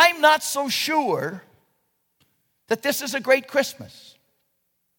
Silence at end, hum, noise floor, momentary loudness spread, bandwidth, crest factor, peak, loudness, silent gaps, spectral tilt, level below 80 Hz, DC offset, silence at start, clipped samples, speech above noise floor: 1.1 s; none; -73 dBFS; 16 LU; 18 kHz; 22 dB; -2 dBFS; -22 LUFS; none; -2 dB/octave; -74 dBFS; under 0.1%; 0 s; under 0.1%; 50 dB